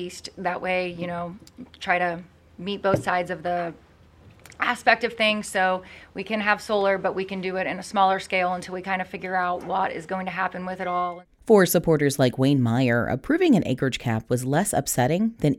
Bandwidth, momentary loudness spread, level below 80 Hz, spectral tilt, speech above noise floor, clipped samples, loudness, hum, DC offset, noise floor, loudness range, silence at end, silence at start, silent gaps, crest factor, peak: 17 kHz; 11 LU; -54 dBFS; -5 dB/octave; 28 dB; under 0.1%; -24 LUFS; none; under 0.1%; -52 dBFS; 6 LU; 0 s; 0 s; none; 22 dB; -2 dBFS